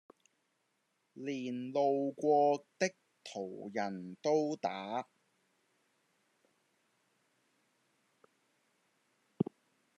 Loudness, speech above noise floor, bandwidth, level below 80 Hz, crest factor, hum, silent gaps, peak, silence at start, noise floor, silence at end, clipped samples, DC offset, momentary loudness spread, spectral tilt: -35 LUFS; 46 dB; 10 kHz; under -90 dBFS; 22 dB; none; none; -16 dBFS; 1.15 s; -80 dBFS; 0.55 s; under 0.1%; under 0.1%; 14 LU; -5.5 dB/octave